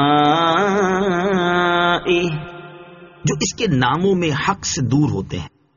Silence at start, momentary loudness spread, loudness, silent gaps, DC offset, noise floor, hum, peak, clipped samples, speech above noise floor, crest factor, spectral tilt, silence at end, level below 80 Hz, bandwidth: 0 s; 10 LU; -17 LUFS; none; under 0.1%; -40 dBFS; none; -4 dBFS; under 0.1%; 22 dB; 14 dB; -4.5 dB/octave; 0.3 s; -46 dBFS; 7.4 kHz